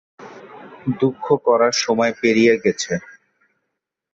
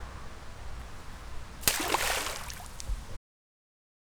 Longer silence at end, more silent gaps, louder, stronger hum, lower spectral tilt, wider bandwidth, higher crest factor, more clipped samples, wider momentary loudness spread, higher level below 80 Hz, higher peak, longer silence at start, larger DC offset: first, 1.15 s vs 1 s; neither; first, -18 LUFS vs -31 LUFS; neither; first, -4.5 dB/octave vs -1.5 dB/octave; second, 8 kHz vs over 20 kHz; second, 16 dB vs 34 dB; neither; second, 13 LU vs 18 LU; second, -60 dBFS vs -44 dBFS; about the same, -4 dBFS vs -2 dBFS; first, 0.2 s vs 0 s; neither